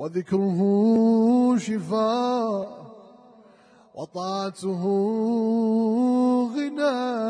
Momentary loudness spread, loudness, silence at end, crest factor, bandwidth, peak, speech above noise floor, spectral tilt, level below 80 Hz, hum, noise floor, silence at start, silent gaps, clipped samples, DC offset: 11 LU; -23 LUFS; 0 s; 12 dB; 10 kHz; -12 dBFS; 32 dB; -7 dB/octave; -72 dBFS; none; -54 dBFS; 0 s; none; under 0.1%; under 0.1%